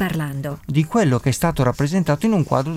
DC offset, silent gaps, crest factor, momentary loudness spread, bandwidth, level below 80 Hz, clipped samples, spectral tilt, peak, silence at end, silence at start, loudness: under 0.1%; none; 14 dB; 6 LU; 16 kHz; -42 dBFS; under 0.1%; -6.5 dB/octave; -4 dBFS; 0 s; 0 s; -20 LUFS